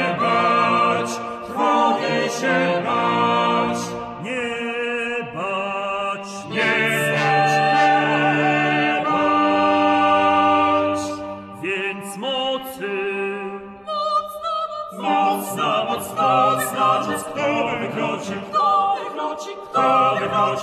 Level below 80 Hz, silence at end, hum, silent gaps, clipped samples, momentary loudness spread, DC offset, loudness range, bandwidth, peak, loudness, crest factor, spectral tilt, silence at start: -60 dBFS; 0 s; none; none; under 0.1%; 11 LU; under 0.1%; 7 LU; 14 kHz; -4 dBFS; -20 LUFS; 16 dB; -4.5 dB/octave; 0 s